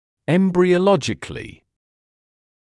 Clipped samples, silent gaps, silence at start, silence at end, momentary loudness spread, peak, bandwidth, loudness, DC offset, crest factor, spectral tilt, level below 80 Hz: under 0.1%; none; 0.3 s; 1.15 s; 18 LU; -4 dBFS; 11 kHz; -18 LUFS; under 0.1%; 16 dB; -6.5 dB/octave; -52 dBFS